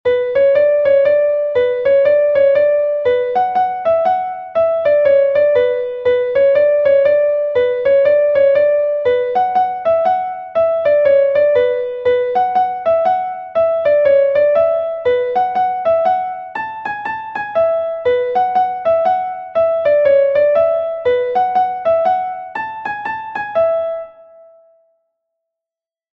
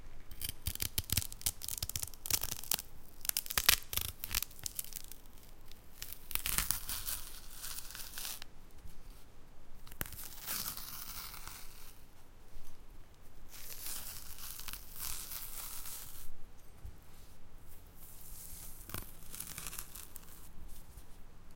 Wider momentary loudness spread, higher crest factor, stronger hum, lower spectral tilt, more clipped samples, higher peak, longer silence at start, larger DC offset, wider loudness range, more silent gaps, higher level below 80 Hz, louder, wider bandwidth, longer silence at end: second, 9 LU vs 24 LU; second, 12 dB vs 38 dB; neither; first, -6 dB/octave vs -1 dB/octave; neither; about the same, -2 dBFS vs -2 dBFS; about the same, 0.05 s vs 0 s; neither; second, 4 LU vs 14 LU; neither; about the same, -54 dBFS vs -50 dBFS; first, -15 LUFS vs -38 LUFS; second, 5.6 kHz vs 17 kHz; first, 2.05 s vs 0 s